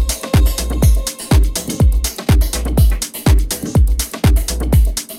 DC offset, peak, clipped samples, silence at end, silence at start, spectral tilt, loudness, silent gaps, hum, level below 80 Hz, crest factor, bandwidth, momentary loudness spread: under 0.1%; -2 dBFS; under 0.1%; 0 s; 0 s; -5 dB/octave; -16 LUFS; none; none; -16 dBFS; 12 dB; 16.5 kHz; 3 LU